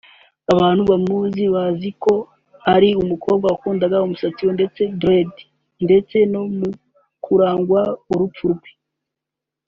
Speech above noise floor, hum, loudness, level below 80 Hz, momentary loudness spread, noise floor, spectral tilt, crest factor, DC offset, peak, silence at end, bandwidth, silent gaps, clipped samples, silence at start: 67 dB; none; -18 LUFS; -52 dBFS; 10 LU; -84 dBFS; -6 dB/octave; 18 dB; under 0.1%; 0 dBFS; 1 s; 7.2 kHz; none; under 0.1%; 0.5 s